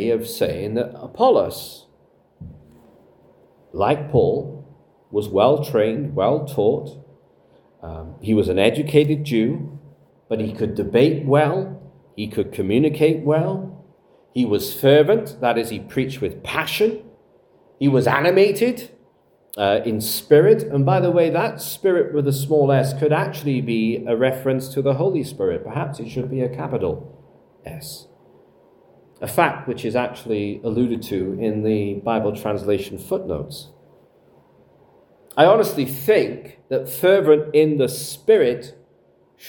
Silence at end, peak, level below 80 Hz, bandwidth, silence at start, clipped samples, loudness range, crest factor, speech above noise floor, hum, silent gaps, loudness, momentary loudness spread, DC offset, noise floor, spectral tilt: 0 s; 0 dBFS; -56 dBFS; 18 kHz; 0 s; under 0.1%; 7 LU; 20 dB; 38 dB; none; none; -20 LUFS; 15 LU; under 0.1%; -57 dBFS; -6 dB/octave